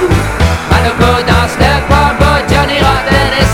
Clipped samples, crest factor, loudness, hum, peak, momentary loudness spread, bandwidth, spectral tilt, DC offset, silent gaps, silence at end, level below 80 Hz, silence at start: 0.7%; 10 dB; -9 LUFS; none; 0 dBFS; 2 LU; 16.5 kHz; -5.5 dB/octave; under 0.1%; none; 0 s; -16 dBFS; 0 s